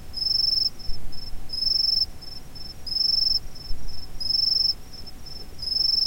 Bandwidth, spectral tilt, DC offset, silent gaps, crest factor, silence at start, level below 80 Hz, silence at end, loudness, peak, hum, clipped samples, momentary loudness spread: 16.5 kHz; -2 dB/octave; 0.3%; none; 12 dB; 0 s; -38 dBFS; 0 s; -22 LUFS; -12 dBFS; none; under 0.1%; 20 LU